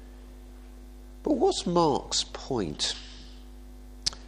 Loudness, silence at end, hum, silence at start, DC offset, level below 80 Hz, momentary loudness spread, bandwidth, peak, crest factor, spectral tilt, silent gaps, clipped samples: -28 LUFS; 0 s; none; 0 s; under 0.1%; -46 dBFS; 24 LU; 15 kHz; -8 dBFS; 24 dB; -4 dB/octave; none; under 0.1%